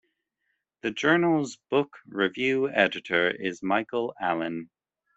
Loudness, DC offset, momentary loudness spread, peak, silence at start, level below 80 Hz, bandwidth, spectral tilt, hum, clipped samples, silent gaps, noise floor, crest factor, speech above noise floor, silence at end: -26 LUFS; under 0.1%; 11 LU; -6 dBFS; 0.85 s; -70 dBFS; 8.2 kHz; -5 dB/octave; none; under 0.1%; none; -79 dBFS; 22 dB; 52 dB; 0.5 s